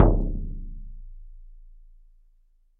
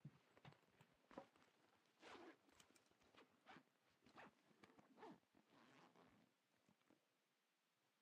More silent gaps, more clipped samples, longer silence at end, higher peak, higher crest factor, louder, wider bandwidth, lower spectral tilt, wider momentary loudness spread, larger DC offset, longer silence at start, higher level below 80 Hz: neither; neither; first, 1.2 s vs 0 s; first, -2 dBFS vs -44 dBFS; about the same, 24 dB vs 26 dB; first, -29 LUFS vs -67 LUFS; second, 2.1 kHz vs 8.4 kHz; first, -11 dB/octave vs -5 dB/octave; first, 25 LU vs 5 LU; neither; about the same, 0 s vs 0 s; first, -30 dBFS vs under -90 dBFS